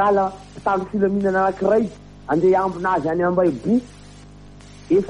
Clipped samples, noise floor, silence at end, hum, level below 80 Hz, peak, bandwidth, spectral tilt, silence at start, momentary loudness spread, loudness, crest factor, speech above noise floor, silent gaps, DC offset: under 0.1%; -42 dBFS; 0 s; 50 Hz at -45 dBFS; -48 dBFS; -6 dBFS; 10 kHz; -8 dB/octave; 0 s; 7 LU; -20 LUFS; 14 dB; 23 dB; none; under 0.1%